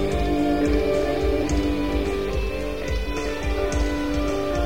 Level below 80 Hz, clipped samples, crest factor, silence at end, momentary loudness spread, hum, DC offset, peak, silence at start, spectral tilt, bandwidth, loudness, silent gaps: -28 dBFS; under 0.1%; 12 dB; 0 s; 6 LU; none; 2%; -10 dBFS; 0 s; -6 dB/octave; 16.5 kHz; -24 LUFS; none